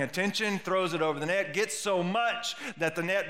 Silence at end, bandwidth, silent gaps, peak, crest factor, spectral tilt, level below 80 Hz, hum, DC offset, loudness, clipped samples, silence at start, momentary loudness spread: 0 s; 16 kHz; none; -14 dBFS; 16 dB; -3.5 dB/octave; -78 dBFS; none; 0.2%; -29 LUFS; under 0.1%; 0 s; 4 LU